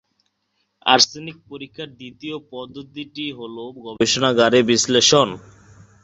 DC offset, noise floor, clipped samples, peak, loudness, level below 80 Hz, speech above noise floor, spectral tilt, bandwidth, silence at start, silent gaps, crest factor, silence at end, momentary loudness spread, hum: under 0.1%; -71 dBFS; under 0.1%; -2 dBFS; -17 LUFS; -58 dBFS; 51 dB; -2.5 dB/octave; 8.2 kHz; 0.85 s; none; 20 dB; 0.65 s; 21 LU; none